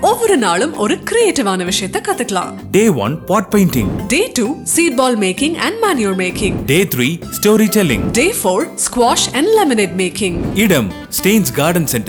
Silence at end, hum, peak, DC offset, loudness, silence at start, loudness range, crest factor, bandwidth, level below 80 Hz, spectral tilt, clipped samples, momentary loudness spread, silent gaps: 0 s; none; -2 dBFS; under 0.1%; -14 LUFS; 0 s; 2 LU; 12 dB; over 20 kHz; -38 dBFS; -4 dB/octave; under 0.1%; 5 LU; none